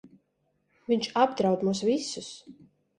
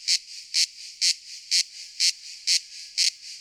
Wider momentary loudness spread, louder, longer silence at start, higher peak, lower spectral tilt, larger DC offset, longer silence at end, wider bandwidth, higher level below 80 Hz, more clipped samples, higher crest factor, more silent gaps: first, 19 LU vs 7 LU; second, -27 LUFS vs -24 LUFS; about the same, 0.05 s vs 0 s; about the same, -8 dBFS vs -8 dBFS; first, -5 dB/octave vs 8 dB/octave; neither; first, 0.45 s vs 0 s; second, 11 kHz vs 19 kHz; first, -70 dBFS vs -80 dBFS; neither; about the same, 22 dB vs 20 dB; neither